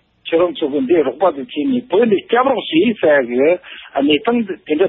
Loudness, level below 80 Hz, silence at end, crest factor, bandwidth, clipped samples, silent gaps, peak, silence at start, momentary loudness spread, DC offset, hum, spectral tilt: -16 LUFS; -58 dBFS; 0 s; 14 dB; 4 kHz; under 0.1%; none; -2 dBFS; 0.25 s; 6 LU; under 0.1%; none; -3 dB/octave